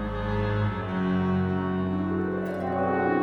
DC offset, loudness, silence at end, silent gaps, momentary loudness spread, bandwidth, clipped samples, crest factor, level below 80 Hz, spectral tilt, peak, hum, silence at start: under 0.1%; -27 LUFS; 0 s; none; 4 LU; 5.6 kHz; under 0.1%; 12 dB; -42 dBFS; -9.5 dB/octave; -14 dBFS; none; 0 s